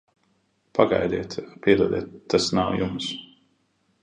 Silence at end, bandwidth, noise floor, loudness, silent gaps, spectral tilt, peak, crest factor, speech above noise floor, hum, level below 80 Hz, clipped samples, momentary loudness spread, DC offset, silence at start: 0.75 s; 10 kHz; -68 dBFS; -24 LUFS; none; -5 dB/octave; -2 dBFS; 22 dB; 45 dB; none; -52 dBFS; under 0.1%; 10 LU; under 0.1%; 0.75 s